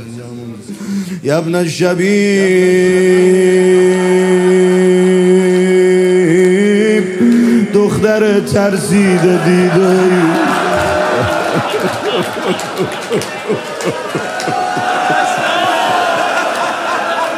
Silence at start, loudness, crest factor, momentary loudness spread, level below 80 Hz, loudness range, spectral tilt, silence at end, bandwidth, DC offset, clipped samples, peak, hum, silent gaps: 0 s; -12 LUFS; 12 dB; 9 LU; -52 dBFS; 6 LU; -5.5 dB/octave; 0 s; 14.5 kHz; under 0.1%; under 0.1%; 0 dBFS; none; none